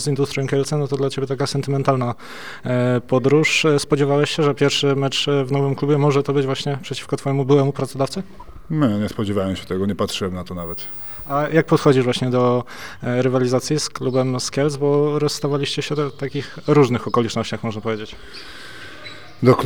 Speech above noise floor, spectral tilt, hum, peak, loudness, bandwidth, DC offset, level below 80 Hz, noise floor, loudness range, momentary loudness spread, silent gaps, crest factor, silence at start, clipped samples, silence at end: 19 dB; -5.5 dB/octave; none; 0 dBFS; -20 LUFS; over 20 kHz; 1%; -52 dBFS; -39 dBFS; 4 LU; 12 LU; none; 20 dB; 0 s; under 0.1%; 0 s